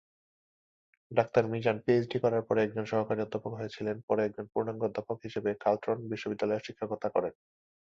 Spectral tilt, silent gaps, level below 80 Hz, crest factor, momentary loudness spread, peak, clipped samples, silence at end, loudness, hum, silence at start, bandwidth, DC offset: -7.5 dB/octave; 4.03-4.08 s; -68 dBFS; 20 dB; 9 LU; -12 dBFS; under 0.1%; 0.65 s; -32 LUFS; none; 1.1 s; 7.4 kHz; under 0.1%